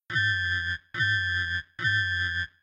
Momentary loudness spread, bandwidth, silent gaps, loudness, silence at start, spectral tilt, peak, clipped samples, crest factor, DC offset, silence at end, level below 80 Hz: 5 LU; 9 kHz; none; -26 LUFS; 0.1 s; -3 dB/octave; -12 dBFS; under 0.1%; 16 dB; under 0.1%; 0.15 s; -52 dBFS